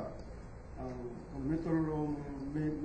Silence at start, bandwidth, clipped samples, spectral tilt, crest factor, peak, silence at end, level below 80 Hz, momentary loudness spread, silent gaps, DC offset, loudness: 0 s; 8.8 kHz; under 0.1%; -9 dB/octave; 14 dB; -24 dBFS; 0 s; -50 dBFS; 16 LU; none; under 0.1%; -38 LUFS